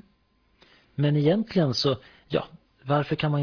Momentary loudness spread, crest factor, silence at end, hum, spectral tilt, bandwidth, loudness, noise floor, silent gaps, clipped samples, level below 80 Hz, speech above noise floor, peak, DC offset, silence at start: 14 LU; 16 dB; 0 s; none; -7 dB/octave; 5.4 kHz; -25 LUFS; -66 dBFS; none; under 0.1%; -60 dBFS; 42 dB; -10 dBFS; under 0.1%; 1 s